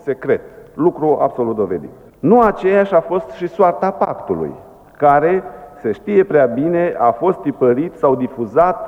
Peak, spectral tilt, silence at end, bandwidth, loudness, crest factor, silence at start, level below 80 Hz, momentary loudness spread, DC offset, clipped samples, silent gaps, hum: -2 dBFS; -9 dB/octave; 0 s; 6.2 kHz; -16 LUFS; 14 dB; 0.05 s; -48 dBFS; 10 LU; under 0.1%; under 0.1%; none; none